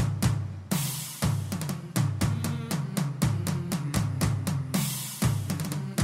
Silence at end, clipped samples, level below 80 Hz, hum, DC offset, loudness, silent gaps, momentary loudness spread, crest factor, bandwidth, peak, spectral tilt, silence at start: 0 s; under 0.1%; -46 dBFS; none; under 0.1%; -29 LUFS; none; 4 LU; 16 dB; 16 kHz; -12 dBFS; -5 dB/octave; 0 s